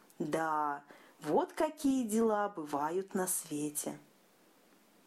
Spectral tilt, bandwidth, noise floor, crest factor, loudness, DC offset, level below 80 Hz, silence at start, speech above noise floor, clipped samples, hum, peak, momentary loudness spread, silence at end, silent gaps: -4.5 dB/octave; 15.5 kHz; -66 dBFS; 16 dB; -35 LUFS; under 0.1%; -74 dBFS; 0.2 s; 32 dB; under 0.1%; none; -18 dBFS; 9 LU; 1.05 s; none